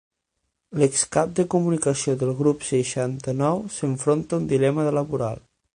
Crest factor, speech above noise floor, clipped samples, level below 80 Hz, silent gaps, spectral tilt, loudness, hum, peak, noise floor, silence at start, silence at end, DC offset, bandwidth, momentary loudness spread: 18 dB; 55 dB; under 0.1%; -56 dBFS; none; -5.5 dB/octave; -23 LUFS; none; -6 dBFS; -77 dBFS; 0.7 s; 0.35 s; under 0.1%; 10.5 kHz; 6 LU